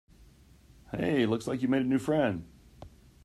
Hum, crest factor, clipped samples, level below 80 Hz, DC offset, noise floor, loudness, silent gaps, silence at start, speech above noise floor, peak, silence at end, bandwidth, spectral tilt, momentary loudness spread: none; 18 dB; under 0.1%; -58 dBFS; under 0.1%; -57 dBFS; -29 LUFS; none; 0.2 s; 29 dB; -14 dBFS; 0.35 s; 13 kHz; -7 dB/octave; 9 LU